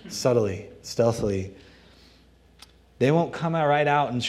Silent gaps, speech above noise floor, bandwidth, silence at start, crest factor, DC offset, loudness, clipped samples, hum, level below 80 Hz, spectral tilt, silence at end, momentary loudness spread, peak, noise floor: none; 32 dB; 14 kHz; 0.05 s; 18 dB; under 0.1%; -24 LUFS; under 0.1%; none; -54 dBFS; -5.5 dB/octave; 0 s; 11 LU; -8 dBFS; -56 dBFS